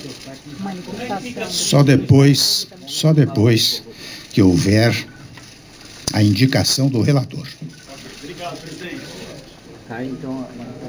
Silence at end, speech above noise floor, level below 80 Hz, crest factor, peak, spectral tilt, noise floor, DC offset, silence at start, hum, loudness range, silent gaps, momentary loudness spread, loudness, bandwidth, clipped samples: 0 s; 24 dB; -50 dBFS; 18 dB; 0 dBFS; -5 dB/octave; -41 dBFS; under 0.1%; 0 s; none; 11 LU; none; 22 LU; -16 LUFS; over 20 kHz; under 0.1%